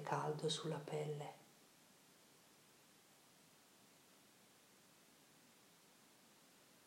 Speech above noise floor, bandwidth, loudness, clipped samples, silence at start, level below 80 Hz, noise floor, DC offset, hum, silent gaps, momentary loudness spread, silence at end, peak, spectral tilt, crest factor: 25 dB; 16 kHz; -45 LUFS; under 0.1%; 0 s; under -90 dBFS; -69 dBFS; under 0.1%; none; none; 24 LU; 0.1 s; -26 dBFS; -4.5 dB/octave; 24 dB